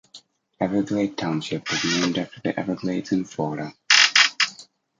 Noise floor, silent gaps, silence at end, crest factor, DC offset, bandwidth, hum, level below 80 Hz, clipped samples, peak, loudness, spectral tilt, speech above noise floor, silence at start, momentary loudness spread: -51 dBFS; none; 0.35 s; 22 dB; under 0.1%; 9.6 kHz; none; -62 dBFS; under 0.1%; -2 dBFS; -21 LUFS; -2.5 dB/octave; 26 dB; 0.15 s; 13 LU